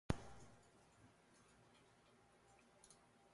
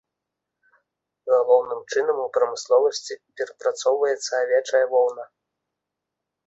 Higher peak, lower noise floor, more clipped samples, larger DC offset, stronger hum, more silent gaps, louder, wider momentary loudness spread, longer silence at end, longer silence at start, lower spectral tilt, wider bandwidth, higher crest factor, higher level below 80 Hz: second, -22 dBFS vs -6 dBFS; second, -72 dBFS vs -84 dBFS; neither; neither; neither; neither; second, -51 LUFS vs -22 LUFS; first, 21 LU vs 12 LU; second, 0.05 s vs 1.2 s; second, 0.1 s vs 1.25 s; first, -6 dB/octave vs -1 dB/octave; first, 11.5 kHz vs 8 kHz; first, 34 dB vs 18 dB; first, -64 dBFS vs -74 dBFS